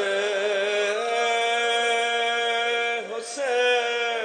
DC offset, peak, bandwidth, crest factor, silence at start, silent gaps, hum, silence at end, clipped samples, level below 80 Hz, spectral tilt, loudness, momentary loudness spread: under 0.1%; -12 dBFS; 9.4 kHz; 12 dB; 0 s; none; none; 0 s; under 0.1%; -90 dBFS; 0 dB/octave; -23 LUFS; 5 LU